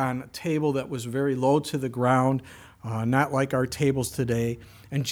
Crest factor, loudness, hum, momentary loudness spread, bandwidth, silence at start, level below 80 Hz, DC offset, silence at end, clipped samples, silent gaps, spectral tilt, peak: 18 dB; -26 LUFS; none; 9 LU; 18 kHz; 0 s; -56 dBFS; under 0.1%; 0 s; under 0.1%; none; -6 dB/octave; -8 dBFS